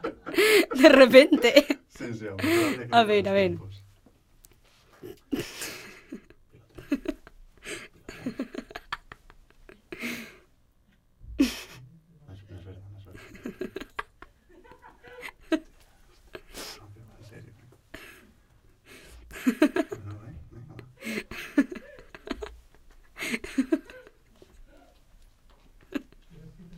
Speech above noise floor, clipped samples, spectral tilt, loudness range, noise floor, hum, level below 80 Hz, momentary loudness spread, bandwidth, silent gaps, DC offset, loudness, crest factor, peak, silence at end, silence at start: 44 dB; under 0.1%; -4.5 dB/octave; 17 LU; -63 dBFS; none; -56 dBFS; 27 LU; 16.5 kHz; none; under 0.1%; -24 LUFS; 26 dB; -2 dBFS; 0 s; 0.05 s